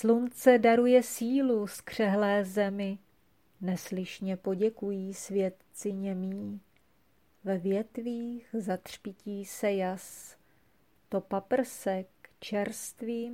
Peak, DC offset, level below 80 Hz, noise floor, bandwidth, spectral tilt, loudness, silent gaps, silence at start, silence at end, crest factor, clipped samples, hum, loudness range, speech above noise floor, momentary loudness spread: -10 dBFS; under 0.1%; -72 dBFS; -69 dBFS; 16.5 kHz; -5.5 dB/octave; -31 LUFS; none; 0 s; 0 s; 20 dB; under 0.1%; none; 9 LU; 40 dB; 16 LU